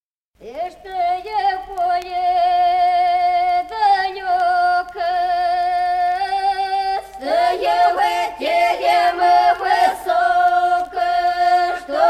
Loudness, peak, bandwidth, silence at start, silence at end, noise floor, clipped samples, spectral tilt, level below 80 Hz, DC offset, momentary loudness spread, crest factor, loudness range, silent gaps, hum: -17 LUFS; -4 dBFS; 13.5 kHz; 0.4 s; 0 s; -41 dBFS; under 0.1%; -2.5 dB/octave; -52 dBFS; under 0.1%; 6 LU; 14 dB; 3 LU; none; none